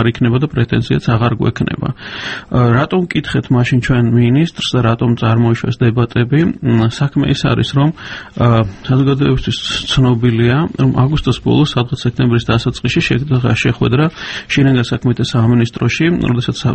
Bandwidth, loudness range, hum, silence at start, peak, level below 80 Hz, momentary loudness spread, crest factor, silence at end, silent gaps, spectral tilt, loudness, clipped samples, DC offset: 8.6 kHz; 1 LU; none; 0 s; 0 dBFS; -34 dBFS; 5 LU; 12 dB; 0 s; none; -7 dB/octave; -14 LUFS; under 0.1%; under 0.1%